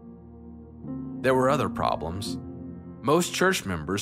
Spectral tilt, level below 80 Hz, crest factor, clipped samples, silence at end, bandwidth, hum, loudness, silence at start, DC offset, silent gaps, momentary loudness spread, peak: -4.5 dB/octave; -52 dBFS; 20 dB; under 0.1%; 0 s; 16 kHz; none; -26 LUFS; 0 s; under 0.1%; none; 23 LU; -8 dBFS